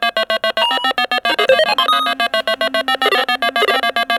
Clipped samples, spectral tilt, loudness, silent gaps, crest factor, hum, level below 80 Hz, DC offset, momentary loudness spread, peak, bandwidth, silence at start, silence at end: under 0.1%; -1 dB/octave; -15 LUFS; none; 16 dB; none; -60 dBFS; under 0.1%; 4 LU; 0 dBFS; 17 kHz; 0 s; 0 s